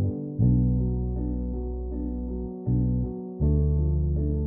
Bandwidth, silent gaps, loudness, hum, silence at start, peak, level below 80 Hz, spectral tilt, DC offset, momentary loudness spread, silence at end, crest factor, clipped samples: 1.2 kHz; none; -27 LUFS; none; 0 s; -10 dBFS; -30 dBFS; -15.5 dB/octave; under 0.1%; 9 LU; 0 s; 14 dB; under 0.1%